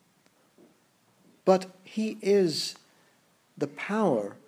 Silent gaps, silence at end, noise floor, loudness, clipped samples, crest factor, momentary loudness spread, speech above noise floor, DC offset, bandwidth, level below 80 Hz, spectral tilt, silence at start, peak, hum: none; 0.15 s; -66 dBFS; -28 LUFS; under 0.1%; 22 dB; 12 LU; 39 dB; under 0.1%; 15.5 kHz; -86 dBFS; -5 dB/octave; 1.45 s; -8 dBFS; none